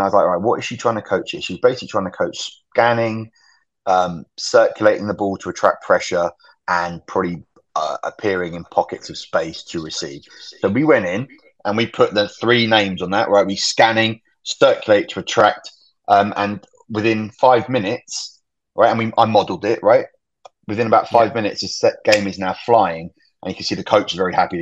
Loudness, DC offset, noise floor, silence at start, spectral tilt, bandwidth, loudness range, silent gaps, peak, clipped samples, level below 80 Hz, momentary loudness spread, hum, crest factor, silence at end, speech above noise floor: -18 LUFS; under 0.1%; -49 dBFS; 0 s; -4.5 dB/octave; 8.6 kHz; 5 LU; none; 0 dBFS; under 0.1%; -58 dBFS; 13 LU; none; 18 dB; 0 s; 32 dB